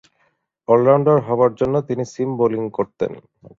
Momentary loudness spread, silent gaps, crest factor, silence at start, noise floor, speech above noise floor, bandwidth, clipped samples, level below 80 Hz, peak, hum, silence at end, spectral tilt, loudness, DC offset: 12 LU; none; 16 dB; 0.7 s; -65 dBFS; 47 dB; 7.6 kHz; under 0.1%; -56 dBFS; -2 dBFS; none; 0.4 s; -8.5 dB/octave; -18 LUFS; under 0.1%